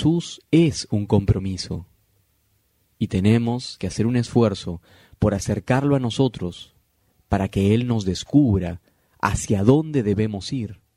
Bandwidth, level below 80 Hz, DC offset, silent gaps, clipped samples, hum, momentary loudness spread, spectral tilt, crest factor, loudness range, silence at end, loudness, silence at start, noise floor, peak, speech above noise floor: 13 kHz; -42 dBFS; under 0.1%; none; under 0.1%; none; 12 LU; -6.5 dB/octave; 20 dB; 3 LU; 0.2 s; -22 LUFS; 0 s; -65 dBFS; -2 dBFS; 45 dB